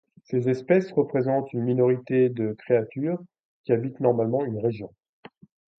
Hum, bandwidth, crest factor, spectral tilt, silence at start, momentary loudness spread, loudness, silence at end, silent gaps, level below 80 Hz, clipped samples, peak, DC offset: none; 6.4 kHz; 18 dB; -10 dB/octave; 0.3 s; 8 LU; -25 LUFS; 0.9 s; 3.45-3.64 s; -68 dBFS; under 0.1%; -6 dBFS; under 0.1%